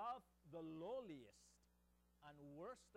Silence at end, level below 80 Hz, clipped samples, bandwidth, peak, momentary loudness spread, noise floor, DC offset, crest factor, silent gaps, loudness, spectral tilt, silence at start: 0 s; -80 dBFS; under 0.1%; 14 kHz; -40 dBFS; 15 LU; -79 dBFS; under 0.1%; 16 dB; none; -55 LUFS; -6 dB/octave; 0 s